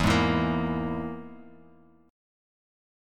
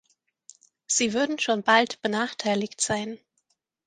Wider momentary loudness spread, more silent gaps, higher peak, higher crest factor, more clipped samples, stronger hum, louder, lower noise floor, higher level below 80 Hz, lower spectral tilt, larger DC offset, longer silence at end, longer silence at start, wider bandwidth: first, 18 LU vs 8 LU; neither; second, -10 dBFS vs -4 dBFS; about the same, 20 dB vs 24 dB; neither; neither; second, -27 LUFS vs -24 LUFS; second, -57 dBFS vs -74 dBFS; first, -44 dBFS vs -66 dBFS; first, -6 dB/octave vs -2.5 dB/octave; neither; first, 1 s vs 0.7 s; second, 0 s vs 0.9 s; first, 16 kHz vs 10 kHz